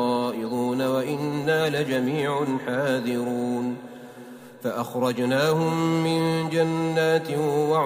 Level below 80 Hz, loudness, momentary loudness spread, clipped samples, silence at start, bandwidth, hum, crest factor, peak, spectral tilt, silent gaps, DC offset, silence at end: -66 dBFS; -24 LUFS; 9 LU; under 0.1%; 0 s; 16 kHz; none; 16 dB; -8 dBFS; -6 dB/octave; none; under 0.1%; 0 s